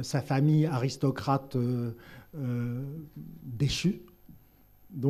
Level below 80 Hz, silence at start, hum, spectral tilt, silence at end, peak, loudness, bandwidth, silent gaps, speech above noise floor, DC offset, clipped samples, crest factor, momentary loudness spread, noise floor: -56 dBFS; 0 s; none; -6.5 dB/octave; 0 s; -12 dBFS; -30 LUFS; 13.5 kHz; none; 29 dB; under 0.1%; under 0.1%; 18 dB; 20 LU; -58 dBFS